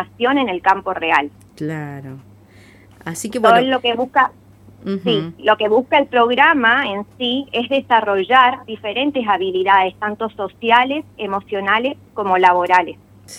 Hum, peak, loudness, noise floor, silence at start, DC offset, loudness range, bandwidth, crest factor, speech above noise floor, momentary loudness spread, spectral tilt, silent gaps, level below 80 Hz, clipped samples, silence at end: none; 0 dBFS; -16 LUFS; -45 dBFS; 0 s; under 0.1%; 4 LU; 15 kHz; 18 dB; 29 dB; 14 LU; -4.5 dB/octave; none; -58 dBFS; under 0.1%; 0 s